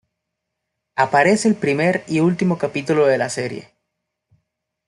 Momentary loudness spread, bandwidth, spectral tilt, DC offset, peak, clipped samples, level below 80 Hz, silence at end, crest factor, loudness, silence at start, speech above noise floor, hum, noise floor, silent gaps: 11 LU; 12 kHz; -5.5 dB/octave; under 0.1%; -2 dBFS; under 0.1%; -62 dBFS; 1.25 s; 18 dB; -18 LUFS; 0.95 s; 61 dB; none; -79 dBFS; none